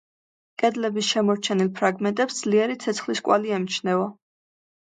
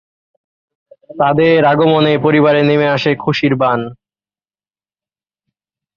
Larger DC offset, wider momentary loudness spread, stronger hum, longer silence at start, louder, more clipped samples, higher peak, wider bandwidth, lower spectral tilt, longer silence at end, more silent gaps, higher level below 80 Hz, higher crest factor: neither; about the same, 4 LU vs 5 LU; neither; second, 0.6 s vs 1.15 s; second, -23 LUFS vs -12 LUFS; neither; second, -6 dBFS vs -2 dBFS; first, 9.4 kHz vs 7 kHz; second, -4.5 dB/octave vs -7.5 dB/octave; second, 0.7 s vs 2 s; neither; second, -74 dBFS vs -54 dBFS; about the same, 18 dB vs 14 dB